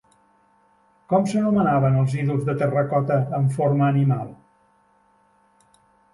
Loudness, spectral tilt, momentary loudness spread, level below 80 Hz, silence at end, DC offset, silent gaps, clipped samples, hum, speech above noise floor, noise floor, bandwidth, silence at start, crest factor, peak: -21 LUFS; -9 dB/octave; 4 LU; -58 dBFS; 1.8 s; under 0.1%; none; under 0.1%; none; 41 dB; -61 dBFS; 11.5 kHz; 1.1 s; 16 dB; -6 dBFS